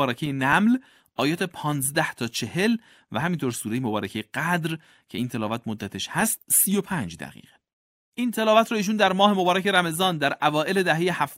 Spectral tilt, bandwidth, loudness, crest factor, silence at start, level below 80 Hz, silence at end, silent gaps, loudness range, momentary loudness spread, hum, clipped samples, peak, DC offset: -4 dB/octave; 16 kHz; -23 LUFS; 20 dB; 0 s; -62 dBFS; 0 s; 7.73-8.12 s; 6 LU; 12 LU; none; under 0.1%; -4 dBFS; under 0.1%